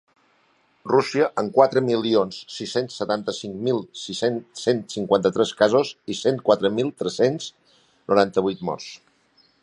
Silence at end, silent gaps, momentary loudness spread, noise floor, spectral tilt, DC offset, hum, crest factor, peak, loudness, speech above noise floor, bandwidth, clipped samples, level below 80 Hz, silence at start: 0.65 s; none; 11 LU; -63 dBFS; -5 dB/octave; under 0.1%; none; 22 dB; -2 dBFS; -22 LUFS; 41 dB; 11 kHz; under 0.1%; -64 dBFS; 0.85 s